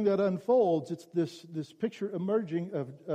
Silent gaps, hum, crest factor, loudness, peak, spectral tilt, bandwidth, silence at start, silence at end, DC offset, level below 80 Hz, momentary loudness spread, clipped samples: none; none; 14 dB; -31 LUFS; -16 dBFS; -8 dB/octave; 10.5 kHz; 0 s; 0 s; under 0.1%; -78 dBFS; 11 LU; under 0.1%